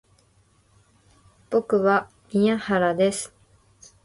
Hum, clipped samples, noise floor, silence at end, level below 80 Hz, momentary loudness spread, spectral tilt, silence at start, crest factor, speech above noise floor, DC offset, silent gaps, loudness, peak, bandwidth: none; under 0.1%; -61 dBFS; 0.75 s; -62 dBFS; 8 LU; -5.5 dB/octave; 1.5 s; 18 dB; 40 dB; under 0.1%; none; -23 LUFS; -8 dBFS; 11.5 kHz